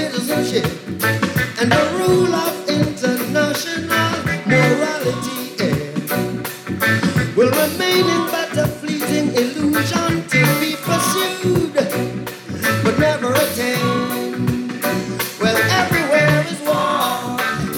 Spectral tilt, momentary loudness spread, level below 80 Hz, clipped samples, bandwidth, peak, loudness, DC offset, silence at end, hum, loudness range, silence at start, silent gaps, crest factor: -4.5 dB/octave; 7 LU; -48 dBFS; under 0.1%; 19 kHz; -4 dBFS; -18 LUFS; under 0.1%; 0 s; none; 1 LU; 0 s; none; 14 dB